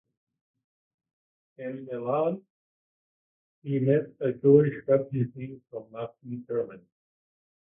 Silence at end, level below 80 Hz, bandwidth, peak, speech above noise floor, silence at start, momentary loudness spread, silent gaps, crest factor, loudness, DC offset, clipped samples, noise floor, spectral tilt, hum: 0.85 s; -70 dBFS; 3.6 kHz; -6 dBFS; over 63 dB; 1.6 s; 20 LU; 2.50-3.62 s; 22 dB; -26 LUFS; under 0.1%; under 0.1%; under -90 dBFS; -12.5 dB/octave; none